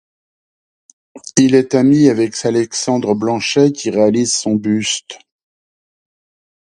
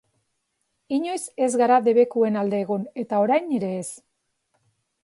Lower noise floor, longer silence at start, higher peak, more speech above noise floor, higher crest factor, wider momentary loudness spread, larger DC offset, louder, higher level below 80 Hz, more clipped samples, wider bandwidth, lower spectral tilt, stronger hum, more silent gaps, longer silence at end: first, under -90 dBFS vs -75 dBFS; first, 1.15 s vs 0.9 s; first, 0 dBFS vs -6 dBFS; first, over 76 dB vs 53 dB; about the same, 16 dB vs 18 dB; second, 7 LU vs 11 LU; neither; first, -14 LUFS vs -22 LUFS; first, -58 dBFS vs -74 dBFS; neither; about the same, 11.5 kHz vs 11.5 kHz; about the same, -4.5 dB/octave vs -5.5 dB/octave; neither; neither; first, 1.55 s vs 1.05 s